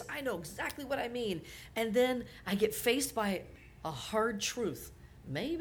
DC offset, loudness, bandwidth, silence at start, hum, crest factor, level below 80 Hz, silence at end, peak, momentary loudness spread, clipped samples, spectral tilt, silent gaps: under 0.1%; -35 LUFS; over 20 kHz; 0 s; none; 18 dB; -58 dBFS; 0 s; -16 dBFS; 12 LU; under 0.1%; -4 dB/octave; none